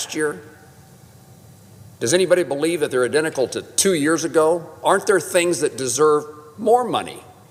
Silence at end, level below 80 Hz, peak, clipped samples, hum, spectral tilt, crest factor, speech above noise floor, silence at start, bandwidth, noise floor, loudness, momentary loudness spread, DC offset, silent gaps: 0.25 s; -64 dBFS; -4 dBFS; under 0.1%; none; -3.5 dB/octave; 16 dB; 27 dB; 0 s; 16 kHz; -46 dBFS; -19 LUFS; 8 LU; under 0.1%; none